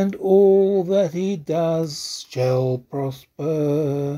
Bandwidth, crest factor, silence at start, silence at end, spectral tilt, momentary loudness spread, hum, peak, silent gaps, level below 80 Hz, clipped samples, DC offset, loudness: 14.5 kHz; 16 dB; 0 s; 0 s; -7 dB/octave; 13 LU; none; -4 dBFS; none; -62 dBFS; under 0.1%; under 0.1%; -20 LUFS